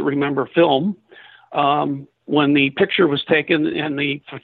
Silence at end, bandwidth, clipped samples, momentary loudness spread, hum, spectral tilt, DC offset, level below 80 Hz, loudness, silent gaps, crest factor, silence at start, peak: 0.05 s; 4.6 kHz; under 0.1%; 9 LU; none; -9.5 dB/octave; under 0.1%; -62 dBFS; -18 LUFS; none; 14 dB; 0 s; -4 dBFS